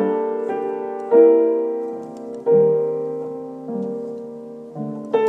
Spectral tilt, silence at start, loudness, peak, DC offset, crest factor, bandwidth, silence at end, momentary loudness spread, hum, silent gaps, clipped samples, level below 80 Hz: -9 dB/octave; 0 s; -20 LUFS; -2 dBFS; under 0.1%; 18 dB; 3.8 kHz; 0 s; 18 LU; none; none; under 0.1%; -78 dBFS